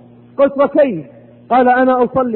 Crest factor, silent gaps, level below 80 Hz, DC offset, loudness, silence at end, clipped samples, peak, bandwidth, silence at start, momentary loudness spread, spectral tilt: 12 dB; none; -52 dBFS; under 0.1%; -13 LUFS; 0 s; under 0.1%; -2 dBFS; 4.2 kHz; 0.4 s; 8 LU; -11 dB/octave